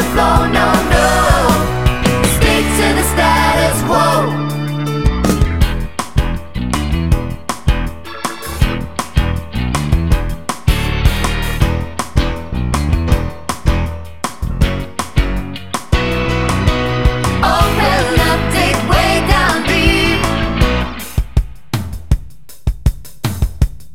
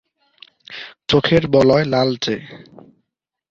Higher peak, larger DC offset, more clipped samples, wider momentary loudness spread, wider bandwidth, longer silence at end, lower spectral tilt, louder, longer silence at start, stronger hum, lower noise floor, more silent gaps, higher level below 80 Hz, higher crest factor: about the same, 0 dBFS vs -2 dBFS; first, 3% vs under 0.1%; neither; second, 10 LU vs 20 LU; first, 17 kHz vs 7.6 kHz; second, 0.15 s vs 0.95 s; about the same, -5 dB/octave vs -6 dB/octave; about the same, -15 LUFS vs -16 LUFS; second, 0 s vs 0.7 s; neither; second, -35 dBFS vs -77 dBFS; neither; first, -20 dBFS vs -48 dBFS; about the same, 14 dB vs 18 dB